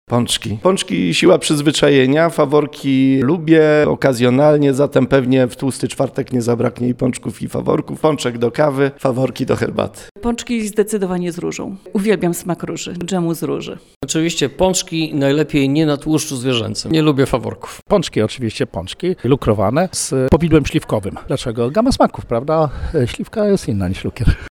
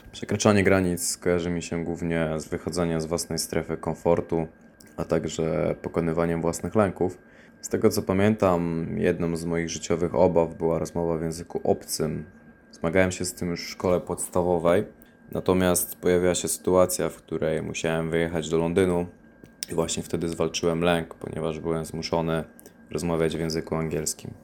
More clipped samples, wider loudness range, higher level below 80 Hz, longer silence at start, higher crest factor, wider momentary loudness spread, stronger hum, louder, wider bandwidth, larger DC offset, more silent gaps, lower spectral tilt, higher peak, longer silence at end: neither; about the same, 6 LU vs 4 LU; first, -34 dBFS vs -52 dBFS; about the same, 0.1 s vs 0.05 s; second, 16 dB vs 22 dB; about the same, 10 LU vs 9 LU; neither; first, -16 LUFS vs -26 LUFS; about the same, 17.5 kHz vs 18 kHz; neither; first, 10.11-10.15 s, 13.96-14.01 s vs none; about the same, -5.5 dB/octave vs -5 dB/octave; first, 0 dBFS vs -4 dBFS; about the same, 0.05 s vs 0.05 s